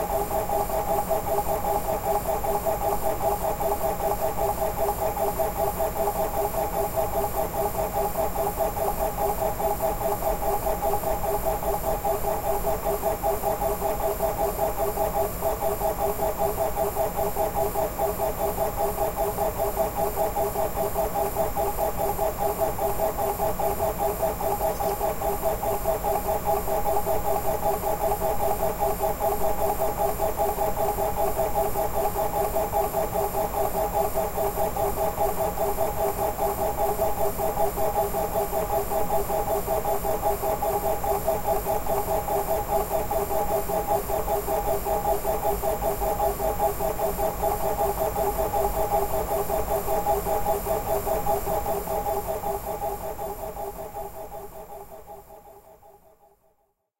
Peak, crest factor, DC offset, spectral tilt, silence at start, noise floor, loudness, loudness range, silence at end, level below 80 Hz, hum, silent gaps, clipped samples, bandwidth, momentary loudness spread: -10 dBFS; 14 dB; under 0.1%; -5 dB/octave; 0 s; -70 dBFS; -26 LUFS; 1 LU; 1.05 s; -38 dBFS; none; none; under 0.1%; 16 kHz; 1 LU